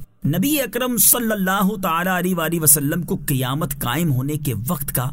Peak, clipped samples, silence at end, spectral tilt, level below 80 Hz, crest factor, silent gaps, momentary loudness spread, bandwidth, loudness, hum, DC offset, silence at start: 0 dBFS; under 0.1%; 0 s; -4 dB/octave; -44 dBFS; 20 dB; none; 10 LU; 16.5 kHz; -18 LUFS; none; 0.4%; 0 s